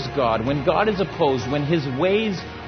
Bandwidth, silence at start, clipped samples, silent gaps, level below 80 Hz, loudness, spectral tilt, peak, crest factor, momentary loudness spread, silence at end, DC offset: 6.6 kHz; 0 s; under 0.1%; none; -44 dBFS; -21 LUFS; -6.5 dB/octave; -4 dBFS; 16 dB; 3 LU; 0 s; under 0.1%